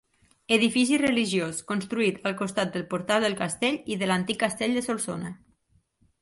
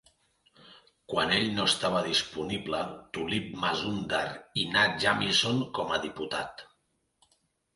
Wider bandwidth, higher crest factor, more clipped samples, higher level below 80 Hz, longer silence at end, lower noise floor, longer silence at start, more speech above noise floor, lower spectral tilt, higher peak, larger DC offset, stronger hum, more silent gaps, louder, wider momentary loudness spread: about the same, 11.5 kHz vs 11.5 kHz; about the same, 20 dB vs 22 dB; neither; about the same, -64 dBFS vs -60 dBFS; second, 0.85 s vs 1.1 s; second, -67 dBFS vs -75 dBFS; second, 0.5 s vs 0.65 s; second, 41 dB vs 45 dB; about the same, -4 dB/octave vs -3.5 dB/octave; first, -6 dBFS vs -10 dBFS; neither; neither; neither; about the same, -26 LUFS vs -28 LUFS; about the same, 8 LU vs 10 LU